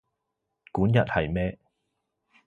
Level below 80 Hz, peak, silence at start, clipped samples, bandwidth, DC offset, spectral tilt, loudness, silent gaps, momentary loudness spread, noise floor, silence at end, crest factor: -46 dBFS; -6 dBFS; 0.75 s; under 0.1%; 6.2 kHz; under 0.1%; -9 dB/octave; -26 LUFS; none; 10 LU; -82 dBFS; 0.9 s; 22 dB